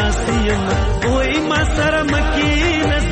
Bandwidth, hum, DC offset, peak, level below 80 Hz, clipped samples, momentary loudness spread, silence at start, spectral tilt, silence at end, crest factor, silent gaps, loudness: 8.8 kHz; none; under 0.1%; -6 dBFS; -22 dBFS; under 0.1%; 2 LU; 0 s; -5 dB/octave; 0 s; 10 dB; none; -17 LUFS